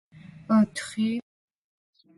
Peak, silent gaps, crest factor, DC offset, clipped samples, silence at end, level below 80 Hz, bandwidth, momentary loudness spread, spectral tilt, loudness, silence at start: -10 dBFS; none; 18 dB; under 0.1%; under 0.1%; 1 s; -66 dBFS; 11.5 kHz; 12 LU; -5.5 dB/octave; -26 LUFS; 0.25 s